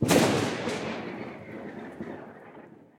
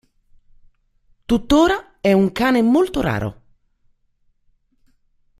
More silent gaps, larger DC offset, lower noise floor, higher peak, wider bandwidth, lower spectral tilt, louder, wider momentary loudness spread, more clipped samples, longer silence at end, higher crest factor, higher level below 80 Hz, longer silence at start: neither; neither; second, -50 dBFS vs -62 dBFS; second, -6 dBFS vs -2 dBFS; about the same, 16.5 kHz vs 15 kHz; second, -4.5 dB/octave vs -6 dB/octave; second, -30 LUFS vs -18 LUFS; first, 24 LU vs 7 LU; neither; second, 0.25 s vs 2.05 s; about the same, 22 dB vs 18 dB; second, -60 dBFS vs -42 dBFS; second, 0 s vs 1.3 s